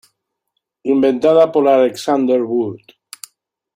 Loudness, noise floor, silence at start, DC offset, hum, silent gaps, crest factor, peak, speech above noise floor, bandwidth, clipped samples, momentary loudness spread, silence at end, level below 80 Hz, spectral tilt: -15 LUFS; -74 dBFS; 0.85 s; under 0.1%; none; none; 14 dB; -2 dBFS; 60 dB; 16.5 kHz; under 0.1%; 20 LU; 1 s; -62 dBFS; -5.5 dB/octave